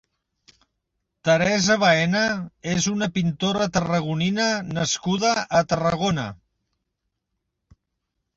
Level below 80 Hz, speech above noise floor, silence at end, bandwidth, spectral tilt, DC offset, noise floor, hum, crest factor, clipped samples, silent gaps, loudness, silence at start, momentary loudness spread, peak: -54 dBFS; 57 dB; 2.05 s; 7.8 kHz; -4.5 dB/octave; under 0.1%; -79 dBFS; none; 18 dB; under 0.1%; none; -22 LUFS; 1.25 s; 7 LU; -6 dBFS